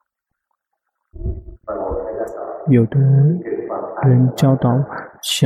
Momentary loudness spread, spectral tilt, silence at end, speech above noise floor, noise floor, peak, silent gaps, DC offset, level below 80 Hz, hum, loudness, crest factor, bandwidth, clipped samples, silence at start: 15 LU; -7 dB/octave; 0 s; 62 dB; -76 dBFS; -4 dBFS; none; under 0.1%; -38 dBFS; none; -17 LUFS; 14 dB; 14.5 kHz; under 0.1%; 1.15 s